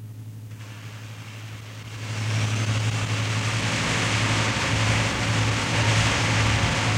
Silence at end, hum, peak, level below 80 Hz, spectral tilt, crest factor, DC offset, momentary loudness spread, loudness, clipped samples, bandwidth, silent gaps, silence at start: 0 s; none; -8 dBFS; -40 dBFS; -4 dB/octave; 16 dB; under 0.1%; 17 LU; -23 LUFS; under 0.1%; 13.5 kHz; none; 0 s